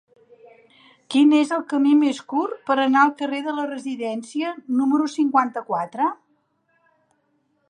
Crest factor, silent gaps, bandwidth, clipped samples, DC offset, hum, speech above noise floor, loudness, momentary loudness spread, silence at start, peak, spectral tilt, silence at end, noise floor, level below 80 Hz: 18 dB; none; 10 kHz; under 0.1%; under 0.1%; none; 47 dB; -21 LUFS; 11 LU; 1.1 s; -4 dBFS; -4 dB/octave; 1.55 s; -68 dBFS; -80 dBFS